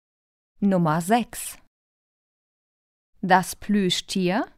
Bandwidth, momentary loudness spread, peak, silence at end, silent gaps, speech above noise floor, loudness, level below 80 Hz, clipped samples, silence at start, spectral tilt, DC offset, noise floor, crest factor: 16 kHz; 12 LU; -4 dBFS; 0.1 s; 1.67-3.13 s; over 68 dB; -23 LUFS; -56 dBFS; under 0.1%; 0.6 s; -5 dB/octave; under 0.1%; under -90 dBFS; 22 dB